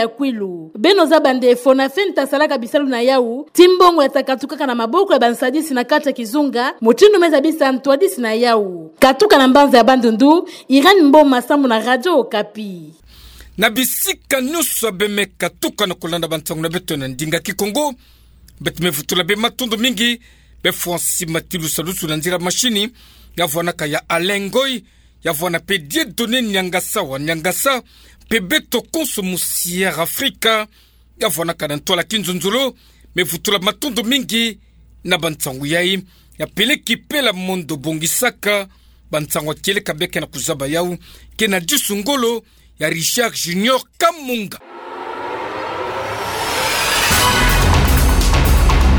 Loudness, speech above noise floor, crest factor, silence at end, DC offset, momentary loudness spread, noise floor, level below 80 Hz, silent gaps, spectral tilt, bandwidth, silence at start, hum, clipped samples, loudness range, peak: -16 LUFS; 24 dB; 16 dB; 0 s; under 0.1%; 12 LU; -40 dBFS; -28 dBFS; none; -3.5 dB/octave; over 20 kHz; 0 s; none; under 0.1%; 7 LU; 0 dBFS